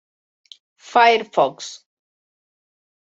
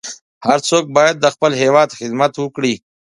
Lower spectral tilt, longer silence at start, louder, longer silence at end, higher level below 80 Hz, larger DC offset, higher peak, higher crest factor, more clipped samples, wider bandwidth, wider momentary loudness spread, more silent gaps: second, -2.5 dB/octave vs -4 dB/octave; first, 0.95 s vs 0.05 s; about the same, -17 LUFS vs -15 LUFS; first, 1.45 s vs 0.3 s; second, -78 dBFS vs -62 dBFS; neither; about the same, -2 dBFS vs 0 dBFS; about the same, 20 dB vs 16 dB; neither; second, 8 kHz vs 11.5 kHz; first, 19 LU vs 8 LU; second, none vs 0.21-0.41 s